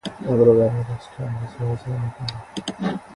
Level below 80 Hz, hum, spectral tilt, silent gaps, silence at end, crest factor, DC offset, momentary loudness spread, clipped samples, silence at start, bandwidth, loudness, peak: -50 dBFS; none; -7.5 dB/octave; none; 0 s; 18 dB; under 0.1%; 15 LU; under 0.1%; 0.05 s; 11.5 kHz; -22 LUFS; -4 dBFS